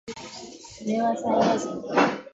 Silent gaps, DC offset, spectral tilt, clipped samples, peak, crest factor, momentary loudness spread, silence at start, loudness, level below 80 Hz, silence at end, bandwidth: none; under 0.1%; -5 dB/octave; under 0.1%; -8 dBFS; 18 dB; 17 LU; 0.05 s; -25 LUFS; -64 dBFS; 0.05 s; 8.2 kHz